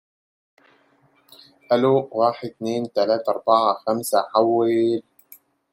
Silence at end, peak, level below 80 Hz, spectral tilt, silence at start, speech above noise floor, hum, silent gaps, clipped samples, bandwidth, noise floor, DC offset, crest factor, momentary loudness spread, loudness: 0.75 s; -4 dBFS; -72 dBFS; -5.5 dB/octave; 1.7 s; 40 dB; none; none; under 0.1%; 16.5 kHz; -60 dBFS; under 0.1%; 20 dB; 7 LU; -21 LUFS